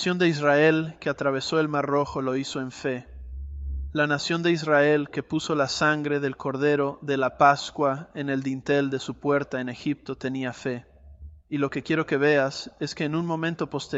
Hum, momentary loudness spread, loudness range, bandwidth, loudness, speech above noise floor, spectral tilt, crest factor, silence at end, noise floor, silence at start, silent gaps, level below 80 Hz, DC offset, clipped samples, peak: none; 11 LU; 5 LU; 8.2 kHz; -25 LUFS; 21 dB; -5.5 dB/octave; 20 dB; 0 s; -46 dBFS; 0 s; none; -46 dBFS; under 0.1%; under 0.1%; -4 dBFS